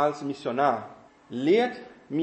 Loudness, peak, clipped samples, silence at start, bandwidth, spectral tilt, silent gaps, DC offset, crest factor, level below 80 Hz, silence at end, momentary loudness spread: -26 LUFS; -8 dBFS; under 0.1%; 0 s; 8.6 kHz; -6.5 dB/octave; none; under 0.1%; 18 dB; -74 dBFS; 0 s; 17 LU